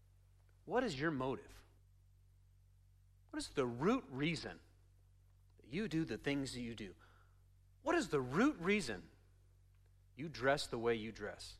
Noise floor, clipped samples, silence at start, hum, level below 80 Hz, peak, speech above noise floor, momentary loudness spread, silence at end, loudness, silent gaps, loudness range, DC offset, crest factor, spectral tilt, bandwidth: -67 dBFS; under 0.1%; 0.65 s; none; -64 dBFS; -20 dBFS; 28 dB; 13 LU; 0 s; -39 LUFS; none; 5 LU; under 0.1%; 22 dB; -5.5 dB/octave; 14 kHz